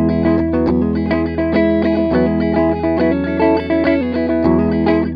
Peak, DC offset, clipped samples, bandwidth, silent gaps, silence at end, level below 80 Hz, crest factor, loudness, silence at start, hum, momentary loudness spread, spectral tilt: 0 dBFS; under 0.1%; under 0.1%; 5.2 kHz; none; 0 s; -32 dBFS; 14 dB; -15 LUFS; 0 s; none; 2 LU; -10 dB/octave